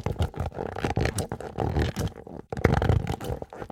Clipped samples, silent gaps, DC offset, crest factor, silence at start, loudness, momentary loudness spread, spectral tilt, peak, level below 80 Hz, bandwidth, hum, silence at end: under 0.1%; none; under 0.1%; 28 dB; 0 s; -29 LUFS; 11 LU; -6.5 dB/octave; 0 dBFS; -36 dBFS; 16.5 kHz; none; 0.05 s